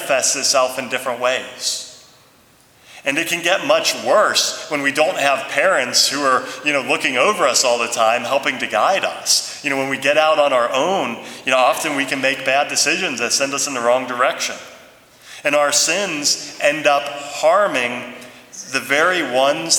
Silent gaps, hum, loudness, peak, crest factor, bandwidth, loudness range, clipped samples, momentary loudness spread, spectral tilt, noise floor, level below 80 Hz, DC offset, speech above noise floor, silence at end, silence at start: none; none; -17 LUFS; 0 dBFS; 18 dB; 19.5 kHz; 3 LU; under 0.1%; 8 LU; -1 dB/octave; -51 dBFS; -68 dBFS; under 0.1%; 34 dB; 0 s; 0 s